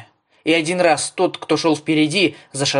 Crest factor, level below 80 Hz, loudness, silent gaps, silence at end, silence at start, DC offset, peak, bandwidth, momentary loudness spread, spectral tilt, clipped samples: 16 dB; -66 dBFS; -18 LUFS; none; 0 s; 0 s; under 0.1%; -2 dBFS; 11 kHz; 6 LU; -4 dB/octave; under 0.1%